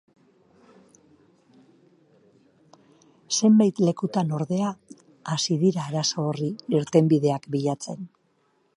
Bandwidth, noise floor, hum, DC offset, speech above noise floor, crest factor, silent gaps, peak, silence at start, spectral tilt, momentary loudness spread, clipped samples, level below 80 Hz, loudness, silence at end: 11 kHz; -67 dBFS; none; under 0.1%; 44 dB; 20 dB; none; -6 dBFS; 3.3 s; -5.5 dB/octave; 14 LU; under 0.1%; -70 dBFS; -24 LUFS; 0.7 s